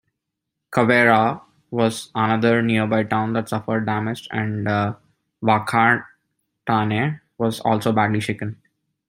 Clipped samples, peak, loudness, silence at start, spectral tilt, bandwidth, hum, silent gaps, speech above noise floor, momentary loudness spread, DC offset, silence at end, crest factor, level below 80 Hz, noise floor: under 0.1%; -2 dBFS; -20 LUFS; 0.7 s; -6.5 dB/octave; 16 kHz; none; none; 61 dB; 10 LU; under 0.1%; 0.55 s; 20 dB; -60 dBFS; -81 dBFS